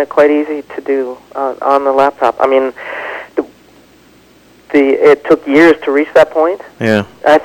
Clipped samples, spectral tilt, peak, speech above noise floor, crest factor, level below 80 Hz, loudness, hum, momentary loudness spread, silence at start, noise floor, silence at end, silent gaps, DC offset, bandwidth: under 0.1%; -6 dB/octave; 0 dBFS; 34 dB; 12 dB; -52 dBFS; -12 LUFS; none; 13 LU; 0 s; -44 dBFS; 0 s; none; under 0.1%; 17 kHz